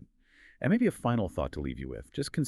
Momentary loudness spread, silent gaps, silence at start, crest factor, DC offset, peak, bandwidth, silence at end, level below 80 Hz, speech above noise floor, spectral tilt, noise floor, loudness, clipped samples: 11 LU; none; 0 s; 18 dB; under 0.1%; -14 dBFS; 13 kHz; 0 s; -48 dBFS; 30 dB; -6.5 dB/octave; -60 dBFS; -31 LUFS; under 0.1%